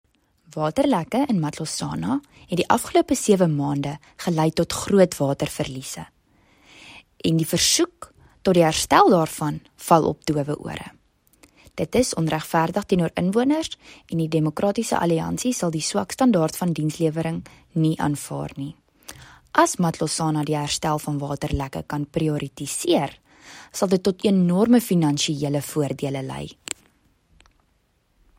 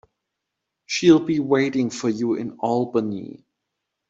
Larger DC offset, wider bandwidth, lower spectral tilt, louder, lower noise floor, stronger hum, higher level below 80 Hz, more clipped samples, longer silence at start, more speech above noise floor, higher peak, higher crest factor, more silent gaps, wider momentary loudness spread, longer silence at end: neither; first, 16 kHz vs 7.8 kHz; about the same, -5 dB/octave vs -5.5 dB/octave; about the same, -22 LUFS vs -21 LUFS; second, -66 dBFS vs -81 dBFS; neither; first, -50 dBFS vs -64 dBFS; neither; second, 0.55 s vs 0.9 s; second, 44 dB vs 61 dB; about the same, 0 dBFS vs -2 dBFS; about the same, 22 dB vs 20 dB; neither; about the same, 14 LU vs 12 LU; first, 1.85 s vs 0.75 s